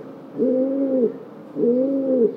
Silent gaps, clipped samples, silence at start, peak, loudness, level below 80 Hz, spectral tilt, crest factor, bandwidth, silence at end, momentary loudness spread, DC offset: none; under 0.1%; 0 s; -8 dBFS; -21 LUFS; -74 dBFS; -10.5 dB/octave; 14 dB; 3.7 kHz; 0 s; 15 LU; under 0.1%